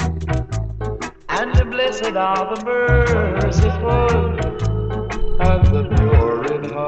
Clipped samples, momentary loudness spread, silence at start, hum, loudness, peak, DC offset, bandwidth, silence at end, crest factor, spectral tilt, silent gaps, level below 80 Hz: under 0.1%; 9 LU; 0 s; none; -19 LUFS; -2 dBFS; under 0.1%; 8.2 kHz; 0 s; 16 dB; -7 dB/octave; none; -22 dBFS